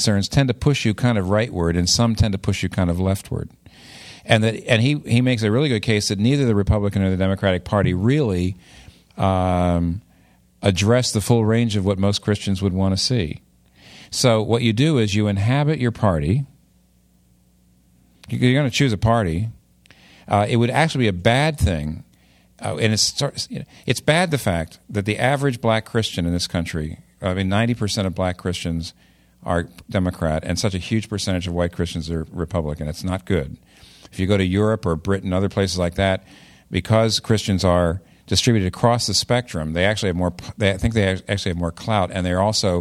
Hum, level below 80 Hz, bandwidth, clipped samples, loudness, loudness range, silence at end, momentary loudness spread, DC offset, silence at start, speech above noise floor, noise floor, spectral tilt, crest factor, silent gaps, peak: none; -40 dBFS; 14.5 kHz; under 0.1%; -20 LUFS; 5 LU; 0 s; 9 LU; under 0.1%; 0 s; 38 dB; -57 dBFS; -5.5 dB/octave; 20 dB; none; 0 dBFS